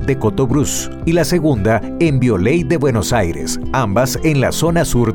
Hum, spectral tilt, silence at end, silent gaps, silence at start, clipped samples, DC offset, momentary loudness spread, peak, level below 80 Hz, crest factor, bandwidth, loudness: none; -5.5 dB/octave; 0 s; none; 0 s; under 0.1%; under 0.1%; 4 LU; -4 dBFS; -30 dBFS; 10 dB; 19 kHz; -16 LUFS